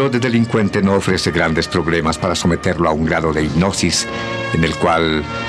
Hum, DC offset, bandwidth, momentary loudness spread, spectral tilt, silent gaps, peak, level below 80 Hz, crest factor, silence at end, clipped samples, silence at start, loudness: none; under 0.1%; 13.5 kHz; 3 LU; -5 dB/octave; none; -2 dBFS; -38 dBFS; 14 dB; 0 s; under 0.1%; 0 s; -16 LUFS